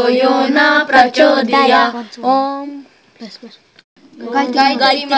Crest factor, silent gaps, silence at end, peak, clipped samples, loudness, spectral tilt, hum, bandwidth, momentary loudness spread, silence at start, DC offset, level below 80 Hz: 14 dB; 3.84-3.96 s; 0 s; 0 dBFS; under 0.1%; -12 LUFS; -3.5 dB/octave; none; 8 kHz; 17 LU; 0 s; under 0.1%; -60 dBFS